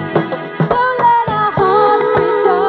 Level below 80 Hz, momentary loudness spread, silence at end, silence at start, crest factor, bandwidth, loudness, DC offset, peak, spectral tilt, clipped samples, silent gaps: -46 dBFS; 6 LU; 0 s; 0 s; 12 dB; 5 kHz; -13 LUFS; under 0.1%; -2 dBFS; -9 dB/octave; under 0.1%; none